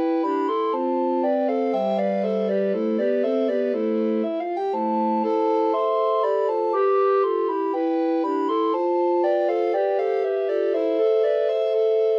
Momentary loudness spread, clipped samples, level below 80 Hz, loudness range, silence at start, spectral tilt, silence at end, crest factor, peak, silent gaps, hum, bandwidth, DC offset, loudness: 3 LU; under 0.1%; -88 dBFS; 1 LU; 0 s; -8 dB/octave; 0 s; 10 dB; -12 dBFS; none; none; 6.6 kHz; under 0.1%; -22 LUFS